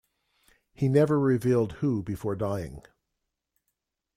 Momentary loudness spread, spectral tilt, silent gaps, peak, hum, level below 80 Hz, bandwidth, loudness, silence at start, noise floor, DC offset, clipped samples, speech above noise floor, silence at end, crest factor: 10 LU; -8.5 dB/octave; none; -10 dBFS; none; -56 dBFS; 14.5 kHz; -26 LUFS; 0.8 s; -83 dBFS; under 0.1%; under 0.1%; 57 dB; 1.35 s; 20 dB